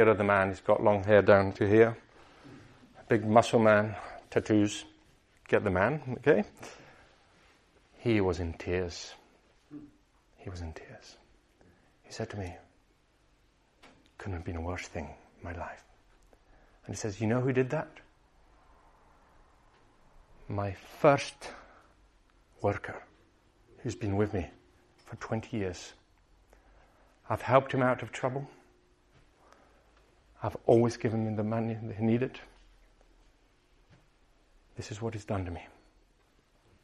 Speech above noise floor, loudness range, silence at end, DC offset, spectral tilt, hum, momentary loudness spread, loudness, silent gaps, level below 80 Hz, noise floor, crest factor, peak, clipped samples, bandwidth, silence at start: 38 dB; 15 LU; 1.15 s; under 0.1%; -6.5 dB/octave; none; 22 LU; -29 LUFS; none; -60 dBFS; -67 dBFS; 24 dB; -8 dBFS; under 0.1%; 12 kHz; 0 s